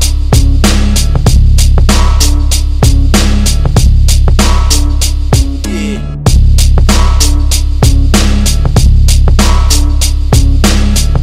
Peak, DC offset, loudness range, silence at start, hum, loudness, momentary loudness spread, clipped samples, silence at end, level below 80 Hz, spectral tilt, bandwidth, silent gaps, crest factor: 0 dBFS; under 0.1%; 1 LU; 0 s; none; -9 LUFS; 3 LU; 2%; 0 s; -8 dBFS; -4.5 dB/octave; 16 kHz; none; 6 dB